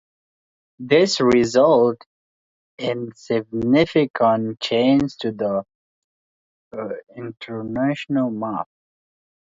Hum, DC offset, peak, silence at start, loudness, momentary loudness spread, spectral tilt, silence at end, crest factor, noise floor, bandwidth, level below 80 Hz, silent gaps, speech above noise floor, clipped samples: none; under 0.1%; -2 dBFS; 0.8 s; -20 LUFS; 17 LU; -5.5 dB/octave; 0.9 s; 18 dB; under -90 dBFS; 7.8 kHz; -56 dBFS; 2.06-2.78 s, 4.10-4.14 s, 5.75-6.71 s; over 71 dB; under 0.1%